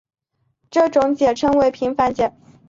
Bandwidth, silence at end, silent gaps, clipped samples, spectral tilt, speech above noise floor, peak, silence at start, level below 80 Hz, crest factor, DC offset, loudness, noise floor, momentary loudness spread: 7.6 kHz; 0.4 s; none; under 0.1%; -5.5 dB/octave; 53 dB; -4 dBFS; 0.7 s; -50 dBFS; 14 dB; under 0.1%; -18 LUFS; -70 dBFS; 7 LU